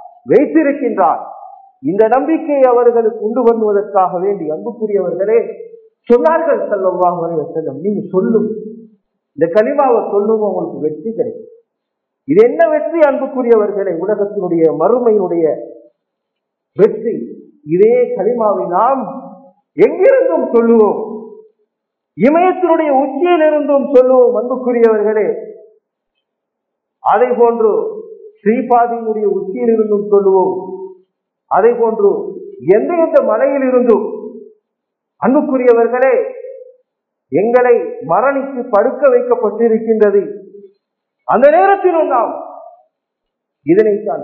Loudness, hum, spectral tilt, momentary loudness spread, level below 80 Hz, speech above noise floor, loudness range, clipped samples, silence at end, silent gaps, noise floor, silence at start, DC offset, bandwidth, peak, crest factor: -13 LUFS; none; -9.5 dB/octave; 13 LU; -64 dBFS; 64 dB; 3 LU; 0.1%; 0 s; none; -76 dBFS; 0 s; under 0.1%; 4.3 kHz; 0 dBFS; 14 dB